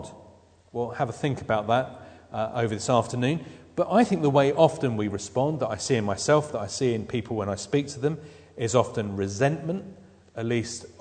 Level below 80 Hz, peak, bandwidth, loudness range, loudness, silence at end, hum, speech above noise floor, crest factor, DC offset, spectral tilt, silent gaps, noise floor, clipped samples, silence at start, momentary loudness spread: -60 dBFS; -4 dBFS; 9.4 kHz; 4 LU; -26 LUFS; 0.1 s; none; 29 dB; 22 dB; under 0.1%; -5.5 dB/octave; none; -54 dBFS; under 0.1%; 0 s; 14 LU